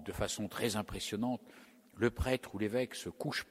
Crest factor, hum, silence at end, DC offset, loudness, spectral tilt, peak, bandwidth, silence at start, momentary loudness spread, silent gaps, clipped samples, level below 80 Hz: 20 dB; none; 0.05 s; under 0.1%; -37 LUFS; -4.5 dB/octave; -18 dBFS; 16 kHz; 0 s; 5 LU; none; under 0.1%; -52 dBFS